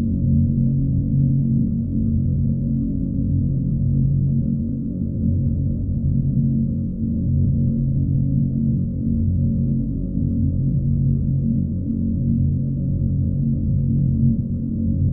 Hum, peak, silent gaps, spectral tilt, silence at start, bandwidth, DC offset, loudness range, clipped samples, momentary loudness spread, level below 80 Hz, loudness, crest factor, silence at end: none; -6 dBFS; none; -17 dB/octave; 0 s; 0.7 kHz; under 0.1%; 1 LU; under 0.1%; 4 LU; -30 dBFS; -21 LUFS; 12 dB; 0 s